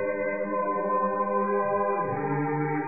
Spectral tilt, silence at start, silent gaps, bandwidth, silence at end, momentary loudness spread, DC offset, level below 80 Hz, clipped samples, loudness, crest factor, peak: -14 dB/octave; 0 s; none; 2.6 kHz; 0 s; 3 LU; 0.4%; -76 dBFS; under 0.1%; -27 LUFS; 12 dB; -16 dBFS